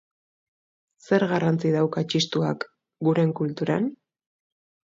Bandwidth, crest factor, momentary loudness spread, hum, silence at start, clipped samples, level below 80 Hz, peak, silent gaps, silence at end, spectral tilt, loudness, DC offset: 7.6 kHz; 18 dB; 6 LU; none; 1.1 s; under 0.1%; -68 dBFS; -8 dBFS; none; 0.9 s; -6.5 dB/octave; -24 LUFS; under 0.1%